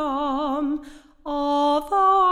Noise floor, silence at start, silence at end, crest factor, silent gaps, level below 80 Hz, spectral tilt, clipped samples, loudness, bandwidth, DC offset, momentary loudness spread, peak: -42 dBFS; 0 s; 0 s; 12 dB; none; -48 dBFS; -4 dB/octave; under 0.1%; -22 LUFS; 13.5 kHz; under 0.1%; 12 LU; -10 dBFS